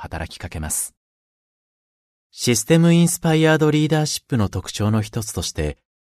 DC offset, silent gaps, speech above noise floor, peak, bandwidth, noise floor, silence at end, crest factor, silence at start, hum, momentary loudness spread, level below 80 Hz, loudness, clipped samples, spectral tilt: under 0.1%; 0.97-2.30 s; over 71 dB; -2 dBFS; 13.5 kHz; under -90 dBFS; 0.3 s; 20 dB; 0 s; none; 14 LU; -42 dBFS; -19 LUFS; under 0.1%; -5 dB/octave